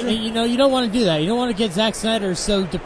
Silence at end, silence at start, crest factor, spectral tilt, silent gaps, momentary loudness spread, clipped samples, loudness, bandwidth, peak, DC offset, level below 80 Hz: 0 s; 0 s; 14 dB; -4.5 dB/octave; none; 4 LU; under 0.1%; -19 LUFS; 11 kHz; -4 dBFS; under 0.1%; -40 dBFS